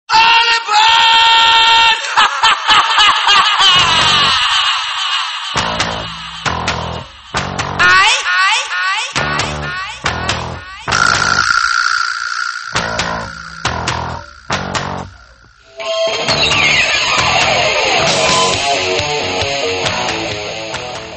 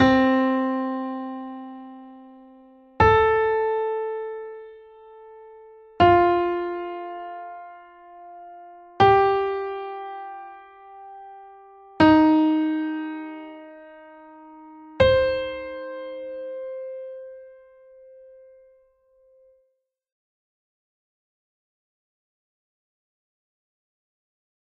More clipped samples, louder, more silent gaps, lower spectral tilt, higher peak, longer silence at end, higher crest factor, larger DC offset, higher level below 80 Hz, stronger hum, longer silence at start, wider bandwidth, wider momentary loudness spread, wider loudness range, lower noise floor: neither; first, -12 LUFS vs -22 LUFS; neither; second, -1.5 dB/octave vs -7.5 dB/octave; first, 0 dBFS vs -4 dBFS; second, 0 s vs 7.25 s; second, 14 dB vs 22 dB; neither; first, -38 dBFS vs -48 dBFS; neither; about the same, 0.1 s vs 0 s; first, 10 kHz vs 6.6 kHz; second, 14 LU vs 26 LU; about the same, 10 LU vs 9 LU; second, -43 dBFS vs -73 dBFS